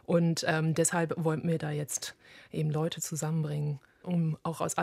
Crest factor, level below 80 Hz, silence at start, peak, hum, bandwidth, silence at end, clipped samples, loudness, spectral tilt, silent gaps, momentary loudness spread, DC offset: 20 dB; -70 dBFS; 0.1 s; -12 dBFS; none; 15 kHz; 0 s; under 0.1%; -31 LUFS; -5 dB/octave; none; 8 LU; under 0.1%